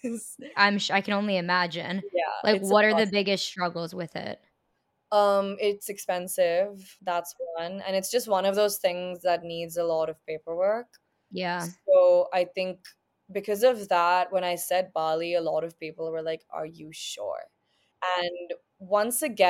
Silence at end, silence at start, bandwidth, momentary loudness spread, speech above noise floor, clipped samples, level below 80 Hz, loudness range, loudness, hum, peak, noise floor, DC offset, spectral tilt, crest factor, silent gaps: 0 s; 0.05 s; 17 kHz; 14 LU; 49 dB; under 0.1%; -76 dBFS; 6 LU; -27 LUFS; none; -6 dBFS; -75 dBFS; under 0.1%; -3.5 dB/octave; 22 dB; none